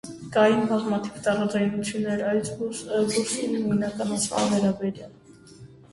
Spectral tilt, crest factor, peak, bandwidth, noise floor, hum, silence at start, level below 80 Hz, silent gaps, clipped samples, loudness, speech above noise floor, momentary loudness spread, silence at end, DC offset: -5 dB/octave; 18 dB; -8 dBFS; 11.5 kHz; -48 dBFS; none; 0.05 s; -60 dBFS; none; under 0.1%; -25 LUFS; 23 dB; 8 LU; 0.15 s; under 0.1%